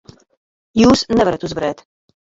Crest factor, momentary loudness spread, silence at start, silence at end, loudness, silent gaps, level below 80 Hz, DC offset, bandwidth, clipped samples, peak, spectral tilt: 16 dB; 11 LU; 0.75 s; 0.6 s; -16 LUFS; none; -42 dBFS; under 0.1%; 7.8 kHz; under 0.1%; -2 dBFS; -5 dB/octave